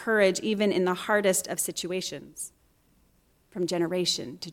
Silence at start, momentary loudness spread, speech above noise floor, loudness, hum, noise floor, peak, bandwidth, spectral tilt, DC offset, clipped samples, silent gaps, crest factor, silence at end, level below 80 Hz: 0 s; 15 LU; 38 dB; -27 LUFS; none; -65 dBFS; -10 dBFS; 17 kHz; -3.5 dB/octave; under 0.1%; under 0.1%; none; 20 dB; 0 s; -66 dBFS